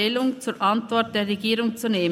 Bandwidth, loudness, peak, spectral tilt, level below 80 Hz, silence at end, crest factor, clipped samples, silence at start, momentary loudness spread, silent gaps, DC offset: 16 kHz; -23 LUFS; -8 dBFS; -4.5 dB/octave; -70 dBFS; 0 s; 16 dB; under 0.1%; 0 s; 2 LU; none; under 0.1%